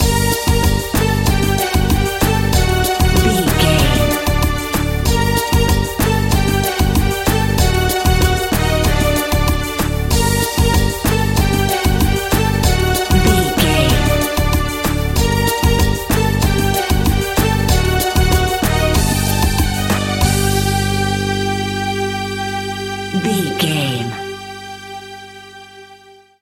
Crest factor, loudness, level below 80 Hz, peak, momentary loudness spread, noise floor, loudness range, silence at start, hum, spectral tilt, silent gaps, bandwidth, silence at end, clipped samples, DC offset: 14 dB; -15 LUFS; -20 dBFS; 0 dBFS; 6 LU; -43 dBFS; 4 LU; 0 s; 50 Hz at -35 dBFS; -4.5 dB/octave; none; 17 kHz; 0.45 s; under 0.1%; under 0.1%